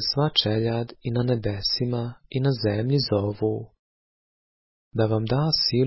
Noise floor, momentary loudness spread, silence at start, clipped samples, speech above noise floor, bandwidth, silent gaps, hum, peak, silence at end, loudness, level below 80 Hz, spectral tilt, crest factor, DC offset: under -90 dBFS; 8 LU; 0 s; under 0.1%; over 66 dB; 5.8 kHz; 3.79-4.91 s; none; -6 dBFS; 0 s; -24 LUFS; -50 dBFS; -9 dB/octave; 18 dB; under 0.1%